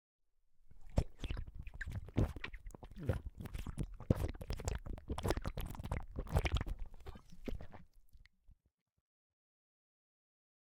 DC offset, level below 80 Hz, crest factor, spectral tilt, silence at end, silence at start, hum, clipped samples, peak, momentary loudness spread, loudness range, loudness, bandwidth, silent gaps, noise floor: under 0.1%; -46 dBFS; 28 dB; -6.5 dB/octave; 2.1 s; 0.55 s; none; under 0.1%; -14 dBFS; 15 LU; 15 LU; -43 LUFS; 17.5 kHz; none; -67 dBFS